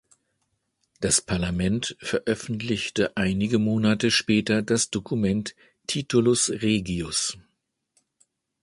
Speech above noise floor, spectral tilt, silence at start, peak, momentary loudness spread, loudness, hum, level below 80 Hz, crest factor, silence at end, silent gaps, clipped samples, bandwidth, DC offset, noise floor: 51 dB; -4 dB/octave; 1 s; -8 dBFS; 8 LU; -24 LUFS; none; -48 dBFS; 18 dB; 1.25 s; none; under 0.1%; 11.5 kHz; under 0.1%; -75 dBFS